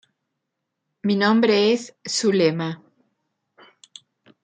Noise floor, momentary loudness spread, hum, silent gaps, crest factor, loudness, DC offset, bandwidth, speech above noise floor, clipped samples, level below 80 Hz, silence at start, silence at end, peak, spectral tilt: -80 dBFS; 12 LU; none; none; 18 dB; -20 LUFS; under 0.1%; 9.4 kHz; 60 dB; under 0.1%; -72 dBFS; 1.05 s; 1.65 s; -6 dBFS; -4.5 dB/octave